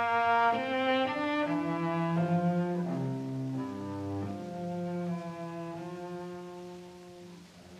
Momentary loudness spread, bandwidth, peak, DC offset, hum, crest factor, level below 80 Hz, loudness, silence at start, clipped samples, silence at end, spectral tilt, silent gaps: 18 LU; 10 kHz; -16 dBFS; under 0.1%; none; 16 dB; -72 dBFS; -32 LUFS; 0 s; under 0.1%; 0 s; -7 dB/octave; none